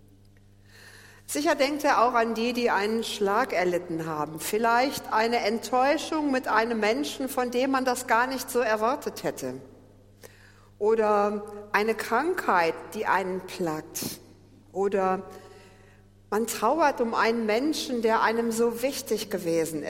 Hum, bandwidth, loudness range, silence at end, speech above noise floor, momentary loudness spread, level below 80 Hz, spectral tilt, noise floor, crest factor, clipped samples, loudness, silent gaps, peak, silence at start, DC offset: none; 16.5 kHz; 3 LU; 0 s; 29 dB; 9 LU; -60 dBFS; -3.5 dB/octave; -55 dBFS; 20 dB; under 0.1%; -26 LUFS; none; -8 dBFS; 0.8 s; under 0.1%